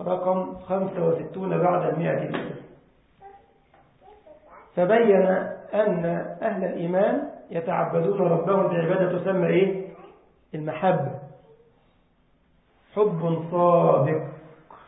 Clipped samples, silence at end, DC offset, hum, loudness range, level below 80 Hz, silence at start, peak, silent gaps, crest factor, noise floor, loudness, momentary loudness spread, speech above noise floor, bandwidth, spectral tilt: under 0.1%; 0.1 s; under 0.1%; none; 6 LU; -66 dBFS; 0 s; -6 dBFS; none; 20 dB; -63 dBFS; -24 LUFS; 13 LU; 40 dB; 4 kHz; -12 dB/octave